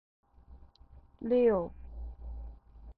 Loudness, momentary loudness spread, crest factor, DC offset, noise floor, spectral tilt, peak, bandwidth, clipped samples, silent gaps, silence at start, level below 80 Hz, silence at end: -30 LUFS; 21 LU; 18 dB; under 0.1%; -57 dBFS; -10.5 dB/octave; -16 dBFS; 4.5 kHz; under 0.1%; none; 0.5 s; -48 dBFS; 0.05 s